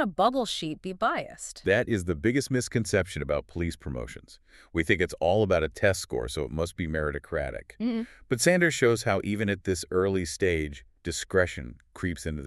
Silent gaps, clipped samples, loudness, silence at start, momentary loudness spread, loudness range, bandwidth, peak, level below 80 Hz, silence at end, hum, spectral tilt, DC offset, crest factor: none; under 0.1%; -28 LUFS; 0 s; 11 LU; 3 LU; 13.5 kHz; -6 dBFS; -46 dBFS; 0 s; none; -5 dB/octave; under 0.1%; 22 dB